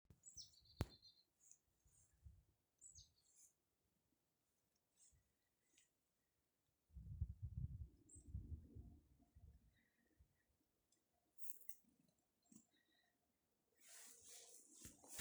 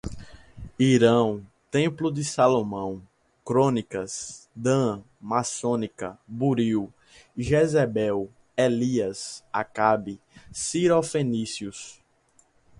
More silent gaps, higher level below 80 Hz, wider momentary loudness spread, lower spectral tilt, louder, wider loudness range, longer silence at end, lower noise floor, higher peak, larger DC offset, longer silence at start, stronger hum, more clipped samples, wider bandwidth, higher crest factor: neither; second, -66 dBFS vs -54 dBFS; second, 13 LU vs 18 LU; about the same, -4.5 dB/octave vs -5.5 dB/octave; second, -57 LUFS vs -25 LUFS; first, 7 LU vs 3 LU; second, 0 s vs 0.9 s; first, -90 dBFS vs -63 dBFS; second, -26 dBFS vs -6 dBFS; neither; about the same, 0.1 s vs 0.05 s; neither; neither; first, over 20 kHz vs 11.5 kHz; first, 36 dB vs 20 dB